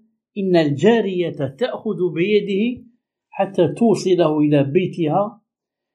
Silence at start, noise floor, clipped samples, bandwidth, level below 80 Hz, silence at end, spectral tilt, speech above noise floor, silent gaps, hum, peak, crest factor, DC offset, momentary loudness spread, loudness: 0.35 s; -83 dBFS; under 0.1%; 11 kHz; -66 dBFS; 0.6 s; -7 dB/octave; 65 dB; none; none; -2 dBFS; 16 dB; under 0.1%; 9 LU; -19 LUFS